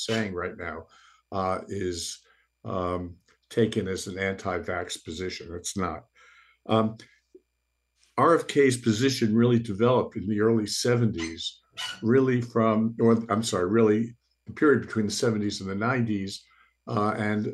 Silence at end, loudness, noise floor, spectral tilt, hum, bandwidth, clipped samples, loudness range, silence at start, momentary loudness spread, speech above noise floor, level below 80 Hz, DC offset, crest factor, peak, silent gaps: 0 s; -26 LUFS; -77 dBFS; -5.5 dB/octave; none; 12.5 kHz; under 0.1%; 8 LU; 0 s; 13 LU; 52 dB; -60 dBFS; under 0.1%; 18 dB; -8 dBFS; none